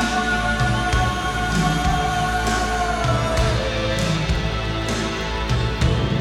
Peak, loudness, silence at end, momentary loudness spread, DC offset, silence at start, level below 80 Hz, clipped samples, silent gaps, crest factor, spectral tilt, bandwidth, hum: -6 dBFS; -21 LUFS; 0 s; 3 LU; under 0.1%; 0 s; -28 dBFS; under 0.1%; none; 14 dB; -5 dB/octave; 15 kHz; none